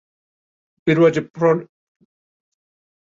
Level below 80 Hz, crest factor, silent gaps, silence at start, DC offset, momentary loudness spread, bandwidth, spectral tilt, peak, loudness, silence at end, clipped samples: -62 dBFS; 18 dB; 1.30-1.34 s; 0.85 s; under 0.1%; 8 LU; 7.6 kHz; -7.5 dB/octave; -4 dBFS; -18 LUFS; 1.45 s; under 0.1%